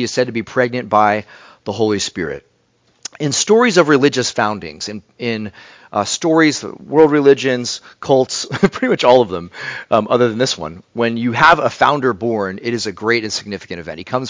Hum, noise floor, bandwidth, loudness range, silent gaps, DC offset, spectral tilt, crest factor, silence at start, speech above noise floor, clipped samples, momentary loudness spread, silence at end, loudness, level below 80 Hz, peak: none; -59 dBFS; 7.8 kHz; 2 LU; none; under 0.1%; -4 dB/octave; 16 dB; 0 s; 43 dB; under 0.1%; 15 LU; 0 s; -16 LUFS; -50 dBFS; 0 dBFS